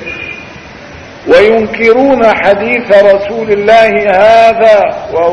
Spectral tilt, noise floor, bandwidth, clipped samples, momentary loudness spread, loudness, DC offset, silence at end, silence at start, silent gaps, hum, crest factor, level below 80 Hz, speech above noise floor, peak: -5.5 dB/octave; -29 dBFS; 9.4 kHz; 3%; 15 LU; -7 LUFS; under 0.1%; 0 s; 0 s; none; none; 8 dB; -40 dBFS; 22 dB; 0 dBFS